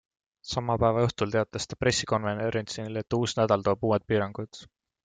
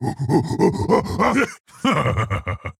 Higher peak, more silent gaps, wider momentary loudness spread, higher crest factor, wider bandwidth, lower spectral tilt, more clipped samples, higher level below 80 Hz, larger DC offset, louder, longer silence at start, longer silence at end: second, -10 dBFS vs -2 dBFS; second, none vs 1.60-1.64 s; first, 10 LU vs 6 LU; about the same, 18 dB vs 18 dB; second, 9.4 kHz vs 15 kHz; second, -5 dB/octave vs -6.5 dB/octave; neither; second, -54 dBFS vs -42 dBFS; neither; second, -27 LUFS vs -20 LUFS; first, 0.45 s vs 0 s; first, 0.4 s vs 0.1 s